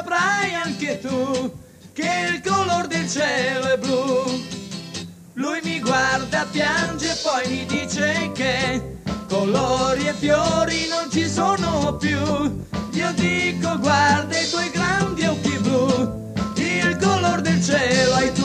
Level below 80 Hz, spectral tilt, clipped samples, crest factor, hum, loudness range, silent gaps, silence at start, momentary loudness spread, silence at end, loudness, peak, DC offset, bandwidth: -44 dBFS; -4 dB/octave; under 0.1%; 16 dB; none; 3 LU; none; 0 s; 8 LU; 0 s; -21 LUFS; -4 dBFS; under 0.1%; 15 kHz